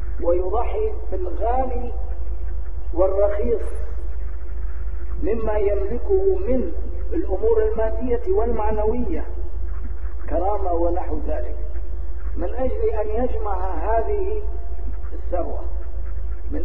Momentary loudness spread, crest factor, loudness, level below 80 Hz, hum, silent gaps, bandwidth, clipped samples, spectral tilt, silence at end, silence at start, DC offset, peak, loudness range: 11 LU; 18 dB; -25 LUFS; -26 dBFS; none; none; 3.1 kHz; under 0.1%; -10.5 dB/octave; 0 s; 0 s; 10%; -4 dBFS; 4 LU